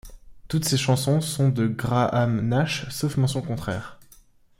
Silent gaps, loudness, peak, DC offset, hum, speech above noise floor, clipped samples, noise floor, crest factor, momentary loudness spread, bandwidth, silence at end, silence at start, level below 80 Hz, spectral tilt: none; -24 LUFS; -8 dBFS; under 0.1%; none; 31 dB; under 0.1%; -54 dBFS; 18 dB; 8 LU; 16.5 kHz; 0.65 s; 0.05 s; -50 dBFS; -5.5 dB/octave